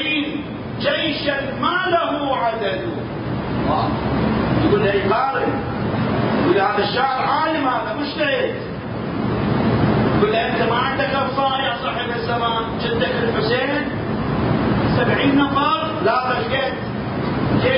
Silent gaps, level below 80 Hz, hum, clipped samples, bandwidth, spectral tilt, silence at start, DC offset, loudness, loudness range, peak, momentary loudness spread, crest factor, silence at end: none; -38 dBFS; none; under 0.1%; 5.4 kHz; -11 dB/octave; 0 s; under 0.1%; -19 LUFS; 2 LU; -4 dBFS; 7 LU; 16 dB; 0 s